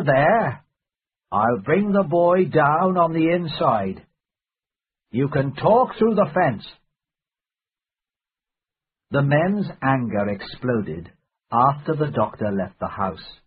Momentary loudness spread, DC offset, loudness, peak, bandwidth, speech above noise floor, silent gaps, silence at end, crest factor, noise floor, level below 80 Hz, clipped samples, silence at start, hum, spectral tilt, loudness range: 10 LU; under 0.1%; -21 LUFS; -4 dBFS; 4.9 kHz; over 70 dB; none; 0.15 s; 18 dB; under -90 dBFS; -54 dBFS; under 0.1%; 0 s; none; -12 dB/octave; 6 LU